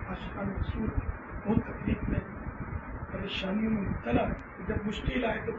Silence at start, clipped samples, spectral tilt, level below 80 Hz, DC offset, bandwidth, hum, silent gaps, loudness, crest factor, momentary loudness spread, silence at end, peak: 0 s; under 0.1%; -8 dB/octave; -40 dBFS; under 0.1%; 7.8 kHz; none; none; -33 LUFS; 20 dB; 9 LU; 0 s; -12 dBFS